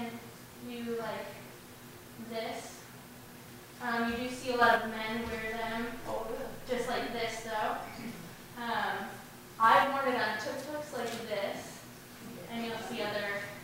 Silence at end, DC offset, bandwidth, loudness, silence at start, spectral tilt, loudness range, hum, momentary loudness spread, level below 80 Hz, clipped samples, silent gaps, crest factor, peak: 0 s; under 0.1%; 16 kHz; -33 LUFS; 0 s; -3.5 dB/octave; 9 LU; none; 22 LU; -58 dBFS; under 0.1%; none; 24 dB; -10 dBFS